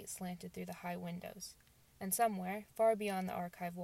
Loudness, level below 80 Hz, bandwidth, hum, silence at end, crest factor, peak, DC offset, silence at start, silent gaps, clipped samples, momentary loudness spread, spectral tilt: -39 LUFS; -74 dBFS; 16 kHz; none; 0 s; 18 dB; -20 dBFS; under 0.1%; 0 s; none; under 0.1%; 14 LU; -4.5 dB/octave